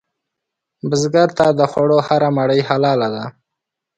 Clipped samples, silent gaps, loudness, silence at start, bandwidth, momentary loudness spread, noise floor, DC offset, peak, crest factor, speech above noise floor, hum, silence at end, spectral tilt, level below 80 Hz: under 0.1%; none; -16 LUFS; 0.85 s; 10.5 kHz; 10 LU; -81 dBFS; under 0.1%; 0 dBFS; 16 dB; 66 dB; none; 0.65 s; -6 dB/octave; -58 dBFS